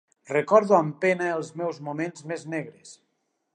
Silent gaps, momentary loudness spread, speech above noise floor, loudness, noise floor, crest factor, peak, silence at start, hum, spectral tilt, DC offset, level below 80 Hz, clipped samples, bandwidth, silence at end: none; 14 LU; 51 dB; -25 LUFS; -76 dBFS; 22 dB; -4 dBFS; 0.3 s; none; -6 dB/octave; under 0.1%; -80 dBFS; under 0.1%; 10 kHz; 0.6 s